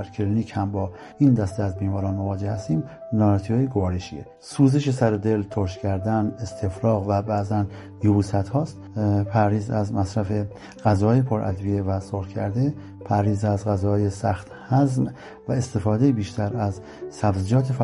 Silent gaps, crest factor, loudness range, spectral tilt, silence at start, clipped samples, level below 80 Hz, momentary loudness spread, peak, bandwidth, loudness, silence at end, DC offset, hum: none; 18 dB; 1 LU; -8 dB/octave; 0 s; under 0.1%; -42 dBFS; 9 LU; -4 dBFS; 11.5 kHz; -23 LUFS; 0 s; under 0.1%; none